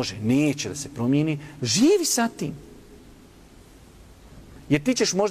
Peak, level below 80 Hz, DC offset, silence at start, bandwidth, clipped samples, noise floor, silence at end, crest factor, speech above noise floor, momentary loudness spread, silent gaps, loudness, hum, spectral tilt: -8 dBFS; -52 dBFS; under 0.1%; 0 s; 15.5 kHz; under 0.1%; -49 dBFS; 0 s; 16 dB; 26 dB; 12 LU; none; -23 LUFS; none; -4.5 dB/octave